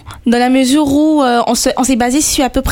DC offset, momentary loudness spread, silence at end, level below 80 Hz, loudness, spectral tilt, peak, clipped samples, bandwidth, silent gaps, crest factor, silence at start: under 0.1%; 2 LU; 0 s; -30 dBFS; -12 LUFS; -3.5 dB/octave; 0 dBFS; under 0.1%; 17.5 kHz; none; 12 dB; 0.05 s